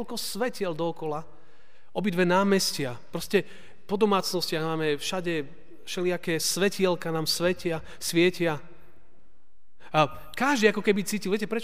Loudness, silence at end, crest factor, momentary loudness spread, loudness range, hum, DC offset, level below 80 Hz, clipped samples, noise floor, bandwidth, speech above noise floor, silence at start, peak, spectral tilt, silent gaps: -27 LUFS; 0 s; 20 dB; 11 LU; 2 LU; none; 1%; -62 dBFS; under 0.1%; -66 dBFS; 16 kHz; 40 dB; 0 s; -8 dBFS; -4 dB/octave; none